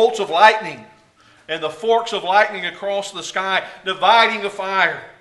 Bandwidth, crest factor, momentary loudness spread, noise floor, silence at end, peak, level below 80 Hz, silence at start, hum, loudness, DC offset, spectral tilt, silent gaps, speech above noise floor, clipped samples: 11.5 kHz; 18 dB; 12 LU; -52 dBFS; 0.1 s; 0 dBFS; -68 dBFS; 0 s; none; -18 LUFS; under 0.1%; -2 dB/octave; none; 34 dB; under 0.1%